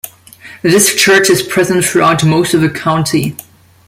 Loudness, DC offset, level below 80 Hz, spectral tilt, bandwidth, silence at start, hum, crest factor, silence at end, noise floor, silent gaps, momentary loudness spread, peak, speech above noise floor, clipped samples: -10 LUFS; under 0.1%; -48 dBFS; -4 dB/octave; 16.5 kHz; 0.05 s; none; 12 dB; 0.45 s; -36 dBFS; none; 10 LU; 0 dBFS; 26 dB; under 0.1%